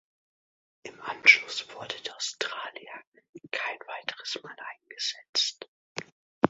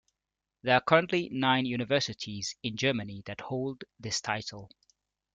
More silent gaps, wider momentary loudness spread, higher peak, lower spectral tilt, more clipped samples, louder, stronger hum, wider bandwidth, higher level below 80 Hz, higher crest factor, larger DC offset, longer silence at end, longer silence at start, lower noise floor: first, 3.07-3.12 s, 3.29-3.33 s, 5.29-5.33 s, 5.68-5.95 s, 6.12-6.42 s vs none; first, 24 LU vs 15 LU; first, -2 dBFS vs -8 dBFS; second, -1.5 dB/octave vs -4 dB/octave; neither; about the same, -27 LUFS vs -29 LUFS; neither; second, 8 kHz vs 9.4 kHz; second, -76 dBFS vs -66 dBFS; about the same, 28 dB vs 24 dB; neither; second, 0 s vs 0.7 s; first, 0.85 s vs 0.65 s; about the same, under -90 dBFS vs -89 dBFS